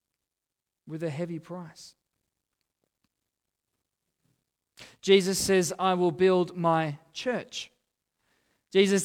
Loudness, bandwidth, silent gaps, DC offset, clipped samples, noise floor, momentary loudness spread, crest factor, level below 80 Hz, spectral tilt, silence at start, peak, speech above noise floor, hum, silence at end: -26 LUFS; 16.5 kHz; none; under 0.1%; under 0.1%; -88 dBFS; 18 LU; 22 dB; -66 dBFS; -4.5 dB/octave; 0.85 s; -8 dBFS; 62 dB; none; 0 s